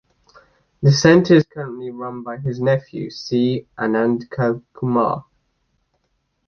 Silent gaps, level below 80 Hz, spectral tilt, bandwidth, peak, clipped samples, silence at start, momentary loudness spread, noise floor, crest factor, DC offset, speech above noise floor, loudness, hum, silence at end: none; -54 dBFS; -6.5 dB/octave; 6.8 kHz; -2 dBFS; under 0.1%; 0.8 s; 16 LU; -69 dBFS; 18 dB; under 0.1%; 51 dB; -19 LUFS; none; 1.25 s